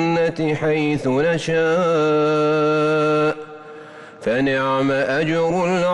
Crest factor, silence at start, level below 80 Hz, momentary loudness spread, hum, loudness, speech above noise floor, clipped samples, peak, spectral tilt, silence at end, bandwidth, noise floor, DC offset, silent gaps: 8 dB; 0 s; -54 dBFS; 12 LU; none; -19 LUFS; 21 dB; under 0.1%; -10 dBFS; -6.5 dB/octave; 0 s; 10.5 kHz; -39 dBFS; under 0.1%; none